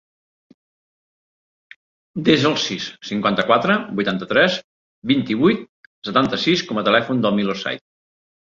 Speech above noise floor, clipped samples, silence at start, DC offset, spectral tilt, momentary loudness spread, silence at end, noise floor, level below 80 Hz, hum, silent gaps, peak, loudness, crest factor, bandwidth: over 71 dB; under 0.1%; 2.15 s; under 0.1%; -5 dB/octave; 11 LU; 0.75 s; under -90 dBFS; -58 dBFS; none; 4.64-5.02 s, 5.69-6.02 s; -2 dBFS; -19 LUFS; 20 dB; 7.6 kHz